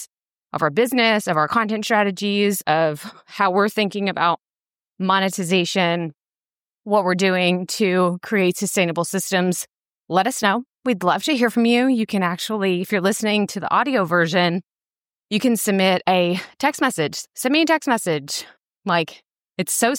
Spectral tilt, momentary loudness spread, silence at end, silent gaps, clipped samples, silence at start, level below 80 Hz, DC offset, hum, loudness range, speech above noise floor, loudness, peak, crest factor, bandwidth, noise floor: -4 dB/octave; 8 LU; 0 s; 6.70-6.74 s, 18.78-18.82 s; under 0.1%; 0 s; -70 dBFS; under 0.1%; none; 2 LU; over 70 dB; -20 LUFS; -4 dBFS; 16 dB; 17 kHz; under -90 dBFS